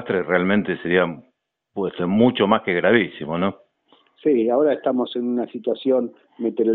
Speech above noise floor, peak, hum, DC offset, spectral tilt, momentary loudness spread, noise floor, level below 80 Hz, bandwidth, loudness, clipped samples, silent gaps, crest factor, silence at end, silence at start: 39 dB; -2 dBFS; none; under 0.1%; -4.5 dB/octave; 9 LU; -59 dBFS; -60 dBFS; 4.2 kHz; -21 LUFS; under 0.1%; none; 18 dB; 0 s; 0 s